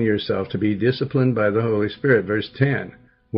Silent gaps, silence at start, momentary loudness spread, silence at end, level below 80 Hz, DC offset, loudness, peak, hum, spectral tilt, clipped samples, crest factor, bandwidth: none; 0 s; 6 LU; 0 s; -56 dBFS; under 0.1%; -21 LUFS; -4 dBFS; none; -10.5 dB/octave; under 0.1%; 18 dB; 5.6 kHz